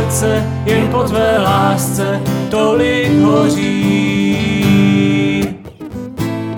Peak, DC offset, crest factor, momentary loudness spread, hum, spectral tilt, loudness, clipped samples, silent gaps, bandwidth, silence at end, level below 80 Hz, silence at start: -2 dBFS; under 0.1%; 12 dB; 10 LU; none; -6 dB/octave; -14 LUFS; under 0.1%; none; 19 kHz; 0 s; -38 dBFS; 0 s